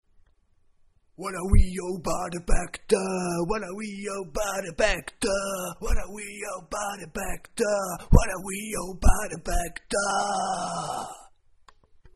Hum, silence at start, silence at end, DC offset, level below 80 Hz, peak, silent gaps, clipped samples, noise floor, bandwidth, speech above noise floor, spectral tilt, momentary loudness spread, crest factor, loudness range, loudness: none; 1.2 s; 0.95 s; under 0.1%; -30 dBFS; 0 dBFS; none; under 0.1%; -62 dBFS; 13 kHz; 37 dB; -4.5 dB/octave; 10 LU; 26 dB; 3 LU; -28 LUFS